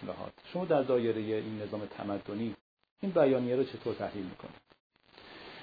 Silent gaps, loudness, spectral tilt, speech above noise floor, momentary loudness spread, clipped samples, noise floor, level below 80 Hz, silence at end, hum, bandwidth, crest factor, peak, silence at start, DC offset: 2.61-2.77 s, 2.91-2.96 s, 4.80-4.90 s; -33 LUFS; -6 dB/octave; 22 dB; 21 LU; under 0.1%; -54 dBFS; -70 dBFS; 0 s; none; 5 kHz; 20 dB; -14 dBFS; 0 s; under 0.1%